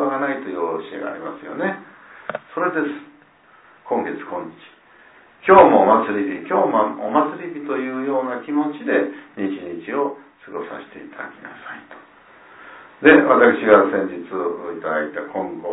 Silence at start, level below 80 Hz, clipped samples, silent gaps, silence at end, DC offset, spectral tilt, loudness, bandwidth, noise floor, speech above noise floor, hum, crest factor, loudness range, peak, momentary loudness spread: 0 s; -60 dBFS; under 0.1%; none; 0 s; under 0.1%; -10 dB/octave; -19 LUFS; 4 kHz; -51 dBFS; 32 dB; none; 20 dB; 11 LU; 0 dBFS; 22 LU